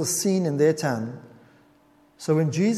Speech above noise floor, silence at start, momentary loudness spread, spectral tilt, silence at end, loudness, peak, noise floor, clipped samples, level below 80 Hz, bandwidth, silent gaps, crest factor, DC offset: 35 dB; 0 s; 14 LU; -5.5 dB/octave; 0 s; -24 LUFS; -8 dBFS; -58 dBFS; under 0.1%; -68 dBFS; 15 kHz; none; 16 dB; under 0.1%